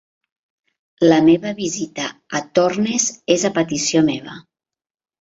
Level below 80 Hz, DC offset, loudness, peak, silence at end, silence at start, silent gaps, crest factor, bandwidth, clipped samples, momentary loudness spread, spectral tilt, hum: -60 dBFS; under 0.1%; -18 LUFS; -2 dBFS; 0.8 s; 1 s; none; 18 dB; 8 kHz; under 0.1%; 12 LU; -4 dB/octave; none